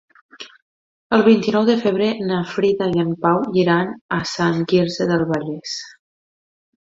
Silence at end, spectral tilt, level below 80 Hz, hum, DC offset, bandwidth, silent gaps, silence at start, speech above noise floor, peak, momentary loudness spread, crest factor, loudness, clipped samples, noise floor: 0.9 s; -6 dB/octave; -58 dBFS; none; under 0.1%; 7.8 kHz; 0.62-1.10 s, 4.01-4.09 s; 0.4 s; over 72 dB; -2 dBFS; 14 LU; 18 dB; -19 LUFS; under 0.1%; under -90 dBFS